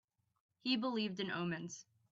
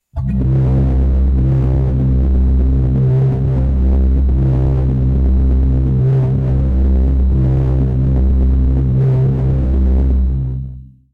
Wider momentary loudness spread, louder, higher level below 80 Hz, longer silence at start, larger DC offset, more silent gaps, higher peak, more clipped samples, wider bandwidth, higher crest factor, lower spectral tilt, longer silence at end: first, 12 LU vs 2 LU; second, -39 LUFS vs -15 LUFS; second, -82 dBFS vs -14 dBFS; first, 0.65 s vs 0.15 s; neither; neither; second, -22 dBFS vs -8 dBFS; neither; first, 7.8 kHz vs 2.5 kHz; first, 18 dB vs 4 dB; second, -3.5 dB/octave vs -11.5 dB/octave; about the same, 0.3 s vs 0.3 s